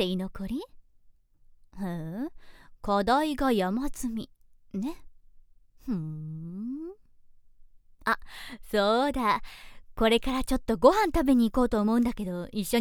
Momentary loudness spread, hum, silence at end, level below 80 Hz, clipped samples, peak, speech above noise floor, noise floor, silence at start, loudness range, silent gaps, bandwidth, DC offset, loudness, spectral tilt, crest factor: 16 LU; none; 0 s; -44 dBFS; under 0.1%; -6 dBFS; 31 dB; -58 dBFS; 0 s; 13 LU; none; 19 kHz; under 0.1%; -28 LUFS; -5.5 dB/octave; 22 dB